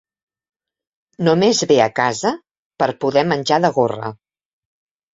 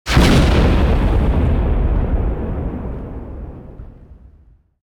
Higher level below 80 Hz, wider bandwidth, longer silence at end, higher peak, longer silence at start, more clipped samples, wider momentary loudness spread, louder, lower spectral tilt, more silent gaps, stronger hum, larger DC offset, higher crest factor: second, -60 dBFS vs -18 dBFS; second, 8 kHz vs 15.5 kHz; first, 1 s vs 0.85 s; about the same, -2 dBFS vs 0 dBFS; first, 1.2 s vs 0.05 s; neither; second, 9 LU vs 20 LU; about the same, -17 LUFS vs -17 LUFS; second, -4.5 dB/octave vs -6.5 dB/octave; first, 2.59-2.70 s vs none; neither; neither; about the same, 18 dB vs 16 dB